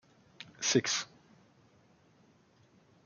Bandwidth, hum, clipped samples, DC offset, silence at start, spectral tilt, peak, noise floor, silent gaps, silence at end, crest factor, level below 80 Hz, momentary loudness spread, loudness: 10.5 kHz; none; under 0.1%; under 0.1%; 0.4 s; -2.5 dB/octave; -14 dBFS; -65 dBFS; none; 2 s; 26 dB; -82 dBFS; 23 LU; -31 LUFS